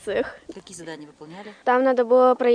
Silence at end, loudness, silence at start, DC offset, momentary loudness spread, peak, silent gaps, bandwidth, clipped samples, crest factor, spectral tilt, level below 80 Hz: 0 s; -20 LUFS; 0.05 s; under 0.1%; 23 LU; -6 dBFS; none; 10 kHz; under 0.1%; 16 dB; -4.5 dB/octave; -62 dBFS